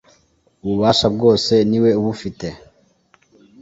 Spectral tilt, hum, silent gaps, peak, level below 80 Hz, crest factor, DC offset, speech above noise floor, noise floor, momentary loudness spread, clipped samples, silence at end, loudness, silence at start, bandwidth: -6 dB/octave; none; none; -2 dBFS; -48 dBFS; 18 dB; under 0.1%; 42 dB; -59 dBFS; 15 LU; under 0.1%; 1.05 s; -16 LUFS; 0.65 s; 8 kHz